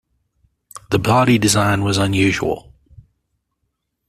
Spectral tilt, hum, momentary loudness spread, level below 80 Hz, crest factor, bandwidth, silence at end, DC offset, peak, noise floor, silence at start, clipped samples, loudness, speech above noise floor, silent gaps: -5 dB/octave; none; 8 LU; -46 dBFS; 16 dB; 14.5 kHz; 1.5 s; under 0.1%; -2 dBFS; -73 dBFS; 0.75 s; under 0.1%; -16 LUFS; 58 dB; none